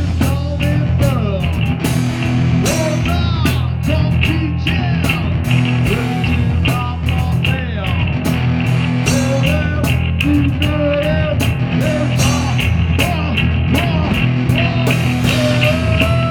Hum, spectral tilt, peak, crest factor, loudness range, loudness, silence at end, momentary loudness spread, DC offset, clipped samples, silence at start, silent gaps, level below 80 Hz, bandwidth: none; -6 dB/octave; 0 dBFS; 14 dB; 1 LU; -15 LUFS; 0 s; 3 LU; under 0.1%; under 0.1%; 0 s; none; -26 dBFS; 18.5 kHz